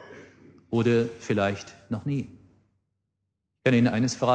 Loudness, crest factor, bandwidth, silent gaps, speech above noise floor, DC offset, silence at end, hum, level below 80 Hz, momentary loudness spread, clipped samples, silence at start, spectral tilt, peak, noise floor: -26 LUFS; 18 dB; 9.2 kHz; none; 56 dB; under 0.1%; 0 s; none; -62 dBFS; 14 LU; under 0.1%; 0 s; -6 dB/octave; -8 dBFS; -80 dBFS